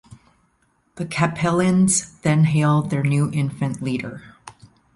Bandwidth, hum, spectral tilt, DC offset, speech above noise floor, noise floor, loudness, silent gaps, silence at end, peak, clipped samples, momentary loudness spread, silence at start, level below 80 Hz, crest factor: 11.5 kHz; none; -5.5 dB/octave; under 0.1%; 45 dB; -64 dBFS; -20 LUFS; none; 0.45 s; -6 dBFS; under 0.1%; 11 LU; 0.95 s; -52 dBFS; 16 dB